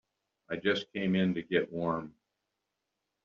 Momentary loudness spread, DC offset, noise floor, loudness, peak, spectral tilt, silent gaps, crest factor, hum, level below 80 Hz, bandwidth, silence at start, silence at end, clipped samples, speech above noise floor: 9 LU; under 0.1%; -85 dBFS; -32 LUFS; -14 dBFS; -4.5 dB/octave; none; 20 dB; none; -70 dBFS; 7 kHz; 0.5 s; 1.15 s; under 0.1%; 54 dB